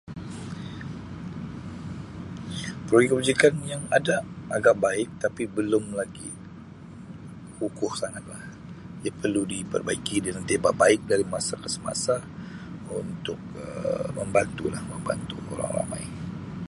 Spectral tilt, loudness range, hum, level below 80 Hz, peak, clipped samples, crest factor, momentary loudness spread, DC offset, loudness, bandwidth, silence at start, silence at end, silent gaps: -4.5 dB/octave; 8 LU; none; -52 dBFS; -2 dBFS; under 0.1%; 24 dB; 18 LU; under 0.1%; -27 LUFS; 11.5 kHz; 0.05 s; 0.05 s; none